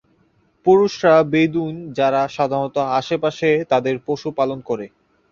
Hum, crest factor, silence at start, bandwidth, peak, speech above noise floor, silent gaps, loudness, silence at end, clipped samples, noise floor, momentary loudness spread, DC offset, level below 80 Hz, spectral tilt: none; 16 dB; 0.65 s; 7.2 kHz; -2 dBFS; 42 dB; none; -19 LUFS; 0.45 s; under 0.1%; -60 dBFS; 11 LU; under 0.1%; -58 dBFS; -6.5 dB/octave